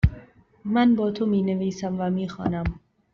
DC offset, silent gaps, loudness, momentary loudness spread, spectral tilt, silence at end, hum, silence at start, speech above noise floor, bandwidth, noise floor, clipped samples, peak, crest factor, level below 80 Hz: under 0.1%; none; -24 LUFS; 11 LU; -7 dB/octave; 0.35 s; none; 0.05 s; 26 dB; 7 kHz; -50 dBFS; under 0.1%; -4 dBFS; 20 dB; -38 dBFS